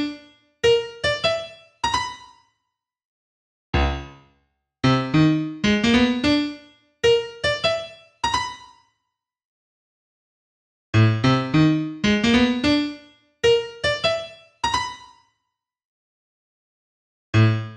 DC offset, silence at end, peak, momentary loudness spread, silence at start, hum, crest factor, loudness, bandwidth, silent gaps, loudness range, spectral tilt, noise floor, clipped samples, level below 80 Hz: under 0.1%; 0 s; -4 dBFS; 14 LU; 0 s; none; 18 dB; -21 LUFS; 11 kHz; 3.05-3.73 s, 9.45-10.93 s, 15.85-17.33 s; 9 LU; -5.5 dB/octave; -80 dBFS; under 0.1%; -40 dBFS